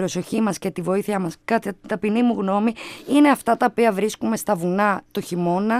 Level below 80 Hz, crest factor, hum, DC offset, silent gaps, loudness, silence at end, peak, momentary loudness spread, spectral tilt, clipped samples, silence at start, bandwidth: -60 dBFS; 18 dB; none; under 0.1%; none; -21 LUFS; 0 s; -4 dBFS; 9 LU; -5.5 dB/octave; under 0.1%; 0 s; 15.5 kHz